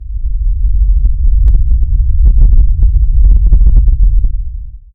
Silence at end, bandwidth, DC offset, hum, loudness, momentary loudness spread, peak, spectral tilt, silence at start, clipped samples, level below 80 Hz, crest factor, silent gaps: 0.15 s; 0.7 kHz; under 0.1%; none; -13 LUFS; 9 LU; 0 dBFS; -12.5 dB/octave; 0 s; 2%; -8 dBFS; 8 dB; none